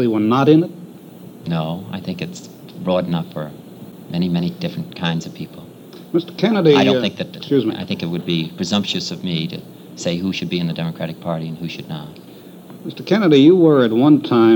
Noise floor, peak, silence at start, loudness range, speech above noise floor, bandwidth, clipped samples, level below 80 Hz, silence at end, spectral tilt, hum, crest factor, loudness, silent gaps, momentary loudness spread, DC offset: -39 dBFS; 0 dBFS; 0 s; 8 LU; 21 dB; 19.5 kHz; under 0.1%; -60 dBFS; 0 s; -6.5 dB/octave; none; 18 dB; -18 LUFS; none; 23 LU; under 0.1%